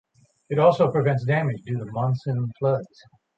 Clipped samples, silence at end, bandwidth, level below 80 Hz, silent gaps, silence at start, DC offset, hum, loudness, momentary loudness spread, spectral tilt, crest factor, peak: under 0.1%; 0.5 s; 7.6 kHz; -62 dBFS; none; 0.5 s; under 0.1%; none; -23 LUFS; 10 LU; -9 dB/octave; 18 dB; -6 dBFS